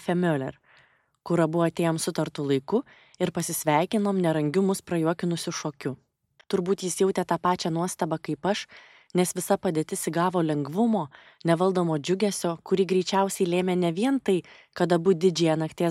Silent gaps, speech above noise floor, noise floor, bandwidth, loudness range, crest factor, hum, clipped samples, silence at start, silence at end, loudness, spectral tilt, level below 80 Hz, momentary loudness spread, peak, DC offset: none; 36 dB; -61 dBFS; 16 kHz; 3 LU; 18 dB; none; under 0.1%; 0 s; 0 s; -26 LUFS; -5.5 dB/octave; -68 dBFS; 7 LU; -8 dBFS; under 0.1%